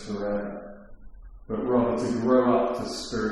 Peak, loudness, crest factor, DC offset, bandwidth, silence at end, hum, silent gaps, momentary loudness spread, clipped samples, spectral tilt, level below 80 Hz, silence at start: -10 dBFS; -25 LUFS; 16 dB; under 0.1%; 12 kHz; 0 s; none; none; 15 LU; under 0.1%; -6 dB/octave; -48 dBFS; 0 s